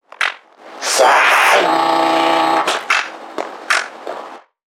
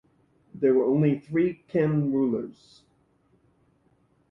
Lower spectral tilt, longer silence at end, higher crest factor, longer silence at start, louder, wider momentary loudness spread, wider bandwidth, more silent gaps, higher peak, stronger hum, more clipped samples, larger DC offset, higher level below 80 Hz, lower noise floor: second, -1 dB/octave vs -10.5 dB/octave; second, 0.4 s vs 1.8 s; about the same, 16 dB vs 16 dB; second, 0.2 s vs 0.55 s; first, -14 LUFS vs -25 LUFS; first, 17 LU vs 6 LU; first, 19 kHz vs 5.8 kHz; neither; first, 0 dBFS vs -12 dBFS; neither; neither; neither; second, -76 dBFS vs -64 dBFS; second, -37 dBFS vs -66 dBFS